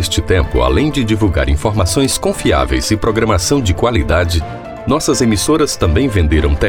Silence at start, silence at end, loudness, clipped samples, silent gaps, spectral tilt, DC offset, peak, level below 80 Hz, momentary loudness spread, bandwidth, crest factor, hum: 0 s; 0 s; -14 LUFS; under 0.1%; none; -5 dB/octave; under 0.1%; 0 dBFS; -22 dBFS; 2 LU; 17.5 kHz; 12 dB; none